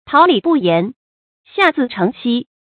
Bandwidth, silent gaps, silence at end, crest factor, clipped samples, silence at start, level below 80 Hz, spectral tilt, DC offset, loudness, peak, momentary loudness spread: 6 kHz; 0.96-1.44 s; 0.3 s; 16 dB; under 0.1%; 0.05 s; -60 dBFS; -7.5 dB/octave; under 0.1%; -15 LUFS; 0 dBFS; 10 LU